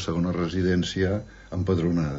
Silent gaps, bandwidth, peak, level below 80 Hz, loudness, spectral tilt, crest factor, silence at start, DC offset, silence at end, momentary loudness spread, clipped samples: none; 8 kHz; -12 dBFS; -44 dBFS; -26 LUFS; -6.5 dB/octave; 14 dB; 0 s; under 0.1%; 0 s; 7 LU; under 0.1%